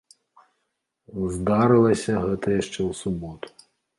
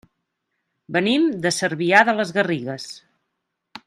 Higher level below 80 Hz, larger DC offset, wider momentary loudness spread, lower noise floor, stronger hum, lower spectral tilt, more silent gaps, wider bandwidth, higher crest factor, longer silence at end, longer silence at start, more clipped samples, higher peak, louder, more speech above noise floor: first, -48 dBFS vs -68 dBFS; neither; first, 20 LU vs 15 LU; about the same, -77 dBFS vs -78 dBFS; neither; first, -6.5 dB/octave vs -4 dB/octave; neither; second, 11.5 kHz vs 13 kHz; about the same, 18 dB vs 22 dB; first, 0.5 s vs 0.1 s; first, 1.1 s vs 0.9 s; neither; second, -6 dBFS vs 0 dBFS; second, -23 LUFS vs -19 LUFS; about the same, 55 dB vs 58 dB